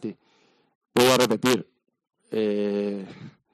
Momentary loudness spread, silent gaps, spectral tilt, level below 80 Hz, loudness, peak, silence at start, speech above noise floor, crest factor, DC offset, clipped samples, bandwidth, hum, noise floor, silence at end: 17 LU; 0.75-0.81 s; -4 dB/octave; -66 dBFS; -23 LUFS; -6 dBFS; 0 s; 41 dB; 20 dB; under 0.1%; under 0.1%; 14.5 kHz; none; -63 dBFS; 0.25 s